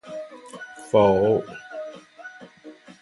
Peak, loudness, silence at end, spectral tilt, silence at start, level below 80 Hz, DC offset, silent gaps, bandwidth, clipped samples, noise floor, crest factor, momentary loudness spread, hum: -6 dBFS; -20 LUFS; 0.3 s; -6.5 dB/octave; 0.05 s; -56 dBFS; under 0.1%; none; 11.5 kHz; under 0.1%; -46 dBFS; 20 dB; 24 LU; none